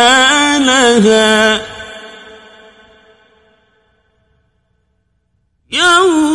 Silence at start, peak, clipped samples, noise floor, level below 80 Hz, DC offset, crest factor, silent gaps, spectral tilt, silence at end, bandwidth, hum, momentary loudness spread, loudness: 0 s; 0 dBFS; 0.1%; -62 dBFS; -48 dBFS; under 0.1%; 14 dB; none; -2.5 dB/octave; 0 s; 12 kHz; none; 21 LU; -9 LUFS